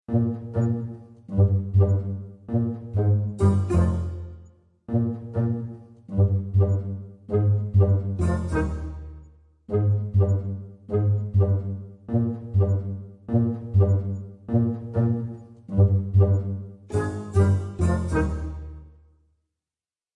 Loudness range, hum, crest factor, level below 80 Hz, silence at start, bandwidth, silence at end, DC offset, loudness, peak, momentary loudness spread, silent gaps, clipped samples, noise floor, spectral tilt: 3 LU; none; 16 dB; -42 dBFS; 0.1 s; 9.2 kHz; 1.25 s; under 0.1%; -24 LUFS; -8 dBFS; 15 LU; none; under 0.1%; under -90 dBFS; -10 dB/octave